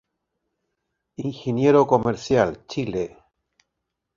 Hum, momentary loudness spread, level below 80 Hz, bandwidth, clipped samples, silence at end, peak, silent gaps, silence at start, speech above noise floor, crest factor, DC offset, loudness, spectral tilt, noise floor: none; 15 LU; -54 dBFS; 7.4 kHz; under 0.1%; 1.1 s; -2 dBFS; none; 1.2 s; 60 dB; 22 dB; under 0.1%; -22 LUFS; -7 dB/octave; -81 dBFS